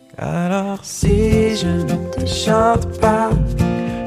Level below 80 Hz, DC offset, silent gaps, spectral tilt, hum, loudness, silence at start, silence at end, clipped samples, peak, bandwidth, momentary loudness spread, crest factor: -28 dBFS; under 0.1%; none; -6 dB/octave; none; -17 LUFS; 0.2 s; 0 s; under 0.1%; -2 dBFS; 15 kHz; 7 LU; 14 dB